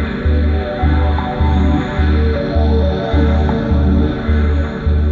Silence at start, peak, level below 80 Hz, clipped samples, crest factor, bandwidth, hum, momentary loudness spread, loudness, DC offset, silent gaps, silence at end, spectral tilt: 0 s; -4 dBFS; -16 dBFS; under 0.1%; 10 dB; 4.6 kHz; none; 3 LU; -15 LUFS; under 0.1%; none; 0 s; -9 dB/octave